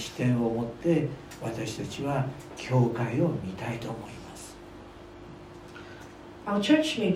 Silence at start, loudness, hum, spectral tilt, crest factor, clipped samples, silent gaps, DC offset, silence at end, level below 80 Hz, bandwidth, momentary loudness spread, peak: 0 s; -29 LUFS; none; -6.5 dB/octave; 20 dB; under 0.1%; none; under 0.1%; 0 s; -56 dBFS; 15 kHz; 22 LU; -10 dBFS